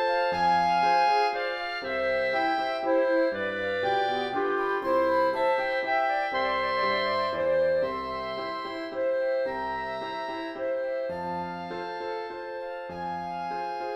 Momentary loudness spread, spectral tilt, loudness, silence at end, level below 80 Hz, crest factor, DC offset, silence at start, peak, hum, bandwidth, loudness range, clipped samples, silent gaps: 10 LU; -5 dB/octave; -27 LUFS; 0 s; -60 dBFS; 14 dB; under 0.1%; 0 s; -12 dBFS; none; 9.6 kHz; 7 LU; under 0.1%; none